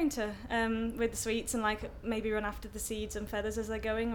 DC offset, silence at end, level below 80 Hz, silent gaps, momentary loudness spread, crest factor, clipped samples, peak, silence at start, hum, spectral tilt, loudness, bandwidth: under 0.1%; 0 s; -48 dBFS; none; 6 LU; 18 dB; under 0.1%; -18 dBFS; 0 s; none; -4 dB/octave; -35 LUFS; 19 kHz